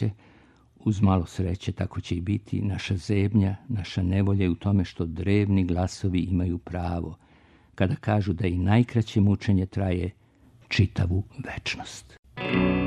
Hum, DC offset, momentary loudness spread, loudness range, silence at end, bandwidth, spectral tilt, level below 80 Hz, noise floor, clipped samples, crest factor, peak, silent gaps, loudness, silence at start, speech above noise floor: none; under 0.1%; 9 LU; 3 LU; 0 s; 9.8 kHz; -7.5 dB/octave; -46 dBFS; -56 dBFS; under 0.1%; 18 dB; -6 dBFS; 12.19-12.23 s; -26 LUFS; 0 s; 31 dB